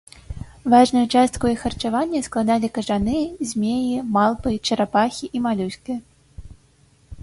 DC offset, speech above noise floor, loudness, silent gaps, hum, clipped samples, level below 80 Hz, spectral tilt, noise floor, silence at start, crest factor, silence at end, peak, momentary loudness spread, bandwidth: under 0.1%; 36 dB; -21 LUFS; none; none; under 0.1%; -44 dBFS; -5 dB/octave; -56 dBFS; 0.3 s; 18 dB; 0 s; -4 dBFS; 13 LU; 11.5 kHz